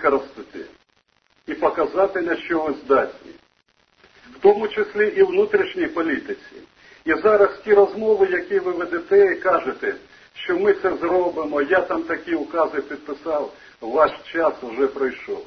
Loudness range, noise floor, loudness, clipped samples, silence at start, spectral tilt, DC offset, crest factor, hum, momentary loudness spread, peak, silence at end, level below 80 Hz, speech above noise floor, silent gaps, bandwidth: 5 LU; -64 dBFS; -20 LUFS; under 0.1%; 0 s; -6.5 dB/octave; under 0.1%; 18 dB; none; 15 LU; -2 dBFS; 0 s; -58 dBFS; 44 dB; none; 6.2 kHz